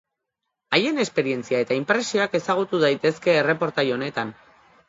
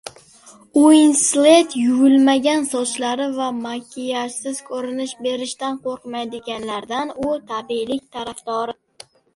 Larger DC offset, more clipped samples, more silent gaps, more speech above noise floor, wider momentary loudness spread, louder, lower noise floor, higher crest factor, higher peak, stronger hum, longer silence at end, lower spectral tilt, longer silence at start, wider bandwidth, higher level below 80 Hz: neither; neither; neither; first, 59 dB vs 29 dB; second, 5 LU vs 15 LU; second, -22 LUFS vs -19 LUFS; first, -81 dBFS vs -47 dBFS; about the same, 20 dB vs 18 dB; second, -4 dBFS vs 0 dBFS; neither; about the same, 0.55 s vs 0.65 s; first, -4.5 dB/octave vs -2.5 dB/octave; first, 0.7 s vs 0.05 s; second, 8 kHz vs 11.5 kHz; second, -68 dBFS vs -62 dBFS